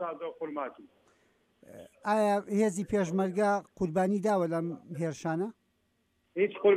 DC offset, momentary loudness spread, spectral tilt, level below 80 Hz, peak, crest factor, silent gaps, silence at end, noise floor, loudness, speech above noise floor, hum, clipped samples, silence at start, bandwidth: under 0.1%; 11 LU; -6.5 dB/octave; -66 dBFS; -12 dBFS; 18 dB; none; 0 s; -74 dBFS; -31 LUFS; 45 dB; none; under 0.1%; 0 s; 14 kHz